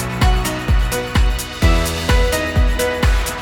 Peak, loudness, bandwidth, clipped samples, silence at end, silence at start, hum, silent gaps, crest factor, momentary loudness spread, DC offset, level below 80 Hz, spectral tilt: -2 dBFS; -17 LUFS; 18 kHz; under 0.1%; 0 s; 0 s; none; none; 14 dB; 2 LU; under 0.1%; -18 dBFS; -4.5 dB/octave